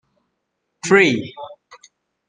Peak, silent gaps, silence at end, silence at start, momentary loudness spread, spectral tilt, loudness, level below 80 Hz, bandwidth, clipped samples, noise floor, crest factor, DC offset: -2 dBFS; none; 0.75 s; 0.85 s; 23 LU; -4.5 dB/octave; -16 LUFS; -64 dBFS; 9.8 kHz; under 0.1%; -75 dBFS; 20 dB; under 0.1%